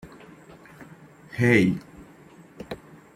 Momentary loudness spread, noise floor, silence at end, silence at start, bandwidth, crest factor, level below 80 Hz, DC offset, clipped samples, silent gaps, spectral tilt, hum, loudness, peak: 28 LU; -50 dBFS; 0.4 s; 0.05 s; 15 kHz; 24 dB; -58 dBFS; under 0.1%; under 0.1%; none; -7 dB/octave; none; -22 LUFS; -4 dBFS